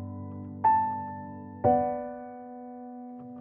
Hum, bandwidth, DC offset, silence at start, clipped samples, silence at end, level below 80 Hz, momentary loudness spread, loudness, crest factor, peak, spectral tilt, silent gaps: none; 3.2 kHz; under 0.1%; 0 s; under 0.1%; 0 s; -62 dBFS; 18 LU; -29 LUFS; 20 dB; -12 dBFS; -9 dB/octave; none